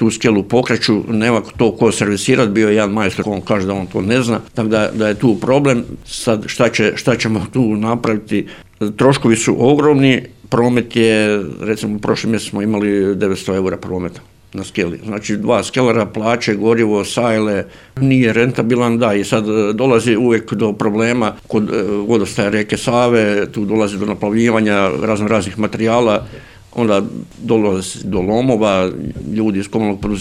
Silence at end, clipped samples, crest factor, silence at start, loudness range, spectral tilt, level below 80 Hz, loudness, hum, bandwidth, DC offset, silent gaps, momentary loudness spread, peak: 0 s; under 0.1%; 14 dB; 0 s; 3 LU; -5.5 dB/octave; -44 dBFS; -15 LUFS; none; 13.5 kHz; under 0.1%; none; 8 LU; 0 dBFS